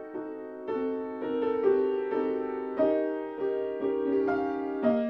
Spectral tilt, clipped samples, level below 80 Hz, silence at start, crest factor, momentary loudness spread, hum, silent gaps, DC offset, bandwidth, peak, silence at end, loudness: -8.5 dB/octave; under 0.1%; -70 dBFS; 0 s; 16 dB; 8 LU; none; none; under 0.1%; 5.4 kHz; -12 dBFS; 0 s; -30 LUFS